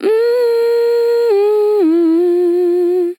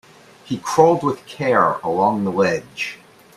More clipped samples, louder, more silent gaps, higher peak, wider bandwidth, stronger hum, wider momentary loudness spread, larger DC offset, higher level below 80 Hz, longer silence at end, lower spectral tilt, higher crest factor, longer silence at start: neither; first, -13 LUFS vs -19 LUFS; neither; second, -4 dBFS vs 0 dBFS; first, 16.5 kHz vs 14 kHz; neither; second, 1 LU vs 12 LU; neither; second, under -90 dBFS vs -60 dBFS; second, 0.05 s vs 0.4 s; about the same, -4.5 dB/octave vs -5.5 dB/octave; second, 8 dB vs 20 dB; second, 0 s vs 0.45 s